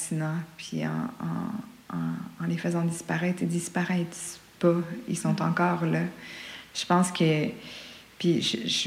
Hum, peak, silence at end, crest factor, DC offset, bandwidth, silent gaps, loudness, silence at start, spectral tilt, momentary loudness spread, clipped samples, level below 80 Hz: none; -12 dBFS; 0 s; 16 dB; under 0.1%; 15.5 kHz; none; -28 LUFS; 0 s; -5 dB/octave; 13 LU; under 0.1%; -66 dBFS